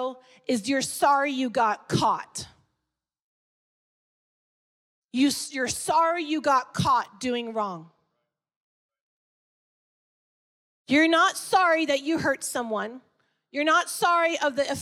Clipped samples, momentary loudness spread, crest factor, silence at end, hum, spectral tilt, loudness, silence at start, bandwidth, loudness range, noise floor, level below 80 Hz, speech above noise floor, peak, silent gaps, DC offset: under 0.1%; 12 LU; 18 dB; 0 s; none; -3.5 dB/octave; -24 LUFS; 0 s; 16.5 kHz; 9 LU; -85 dBFS; -66 dBFS; 60 dB; -10 dBFS; 3.22-5.02 s, 8.56-8.89 s, 9.01-10.85 s; under 0.1%